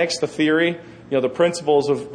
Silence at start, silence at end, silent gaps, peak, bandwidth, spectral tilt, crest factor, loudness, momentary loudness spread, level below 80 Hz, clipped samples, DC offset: 0 s; 0 s; none; -6 dBFS; 10 kHz; -4.5 dB/octave; 14 dB; -20 LUFS; 5 LU; -60 dBFS; under 0.1%; under 0.1%